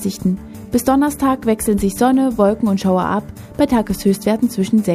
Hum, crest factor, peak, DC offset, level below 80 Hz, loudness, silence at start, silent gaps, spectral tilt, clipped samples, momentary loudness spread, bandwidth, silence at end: none; 16 dB; 0 dBFS; under 0.1%; -40 dBFS; -17 LUFS; 0 s; none; -6 dB/octave; under 0.1%; 6 LU; 15.5 kHz; 0 s